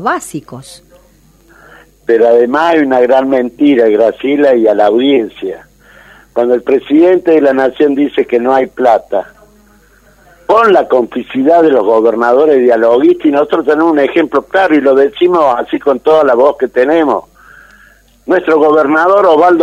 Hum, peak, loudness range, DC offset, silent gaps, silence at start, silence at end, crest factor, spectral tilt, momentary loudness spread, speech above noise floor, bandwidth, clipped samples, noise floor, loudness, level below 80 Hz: none; 0 dBFS; 3 LU; under 0.1%; none; 0 s; 0 s; 10 dB; -5.5 dB/octave; 9 LU; 37 dB; 12.5 kHz; 0.2%; -45 dBFS; -9 LUFS; -50 dBFS